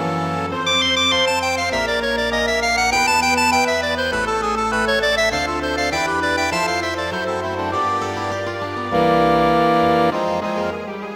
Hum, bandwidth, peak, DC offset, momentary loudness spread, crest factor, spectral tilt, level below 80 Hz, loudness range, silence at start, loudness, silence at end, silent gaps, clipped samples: none; 16 kHz; -4 dBFS; under 0.1%; 7 LU; 16 dB; -3.5 dB/octave; -40 dBFS; 4 LU; 0 s; -18 LUFS; 0 s; none; under 0.1%